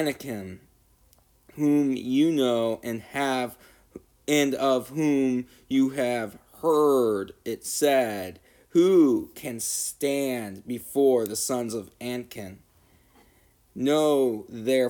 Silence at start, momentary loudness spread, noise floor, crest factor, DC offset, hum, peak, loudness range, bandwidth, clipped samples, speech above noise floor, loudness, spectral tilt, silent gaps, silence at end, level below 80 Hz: 0 s; 14 LU; -61 dBFS; 16 dB; under 0.1%; none; -10 dBFS; 5 LU; 19.5 kHz; under 0.1%; 36 dB; -25 LUFS; -4.5 dB/octave; none; 0 s; -64 dBFS